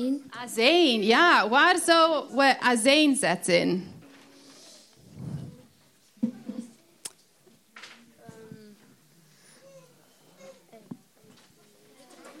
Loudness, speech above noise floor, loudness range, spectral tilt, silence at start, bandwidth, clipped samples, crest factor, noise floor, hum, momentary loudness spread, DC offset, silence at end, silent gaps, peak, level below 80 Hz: -22 LUFS; 39 dB; 20 LU; -3 dB/octave; 0 s; 15.5 kHz; under 0.1%; 20 dB; -61 dBFS; none; 23 LU; under 0.1%; 0.1 s; none; -6 dBFS; -76 dBFS